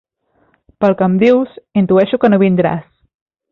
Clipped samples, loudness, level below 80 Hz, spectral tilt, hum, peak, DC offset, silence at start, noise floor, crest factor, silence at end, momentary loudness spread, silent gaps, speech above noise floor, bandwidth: under 0.1%; -13 LUFS; -52 dBFS; -9.5 dB/octave; none; -2 dBFS; under 0.1%; 0.8 s; -59 dBFS; 14 dB; 0.7 s; 7 LU; none; 47 dB; 5.6 kHz